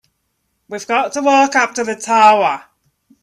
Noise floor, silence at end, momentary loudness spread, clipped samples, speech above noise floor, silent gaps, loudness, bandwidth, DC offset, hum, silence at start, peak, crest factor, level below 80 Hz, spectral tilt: -68 dBFS; 0.65 s; 16 LU; under 0.1%; 55 dB; none; -14 LUFS; 12.5 kHz; under 0.1%; none; 0.7 s; 0 dBFS; 16 dB; -66 dBFS; -2.5 dB/octave